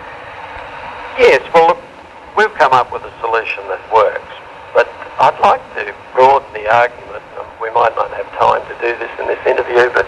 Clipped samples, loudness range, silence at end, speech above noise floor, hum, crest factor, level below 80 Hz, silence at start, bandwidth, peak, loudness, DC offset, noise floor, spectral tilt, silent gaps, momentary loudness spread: under 0.1%; 2 LU; 0 s; 22 dB; none; 14 dB; -48 dBFS; 0 s; 11 kHz; 0 dBFS; -14 LUFS; under 0.1%; -35 dBFS; -4.5 dB/octave; none; 18 LU